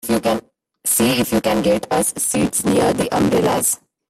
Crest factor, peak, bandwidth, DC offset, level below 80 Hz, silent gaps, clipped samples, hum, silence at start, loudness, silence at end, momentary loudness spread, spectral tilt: 14 dB; -4 dBFS; 16 kHz; under 0.1%; -46 dBFS; none; under 0.1%; none; 0.05 s; -17 LUFS; 0.35 s; 3 LU; -4 dB/octave